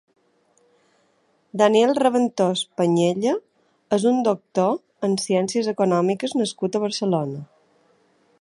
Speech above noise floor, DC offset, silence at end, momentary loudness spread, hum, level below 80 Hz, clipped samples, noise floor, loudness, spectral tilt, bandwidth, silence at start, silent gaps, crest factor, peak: 44 dB; under 0.1%; 0.95 s; 7 LU; none; -72 dBFS; under 0.1%; -64 dBFS; -21 LUFS; -5.5 dB/octave; 11.5 kHz; 1.55 s; none; 18 dB; -4 dBFS